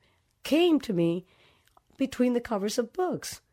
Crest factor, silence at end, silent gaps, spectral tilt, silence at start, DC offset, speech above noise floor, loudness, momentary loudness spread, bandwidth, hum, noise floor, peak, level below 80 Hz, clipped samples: 16 dB; 0.15 s; none; -5.5 dB/octave; 0.45 s; under 0.1%; 36 dB; -28 LUFS; 11 LU; 16 kHz; none; -63 dBFS; -14 dBFS; -62 dBFS; under 0.1%